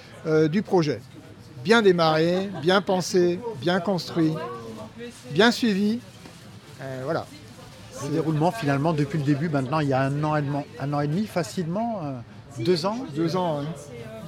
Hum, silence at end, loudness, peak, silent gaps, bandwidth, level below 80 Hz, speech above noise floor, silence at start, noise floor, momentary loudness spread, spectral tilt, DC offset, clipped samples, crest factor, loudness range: none; 0 s; -24 LUFS; -6 dBFS; none; 16 kHz; -60 dBFS; 21 dB; 0 s; -44 dBFS; 19 LU; -6 dB/octave; under 0.1%; under 0.1%; 20 dB; 5 LU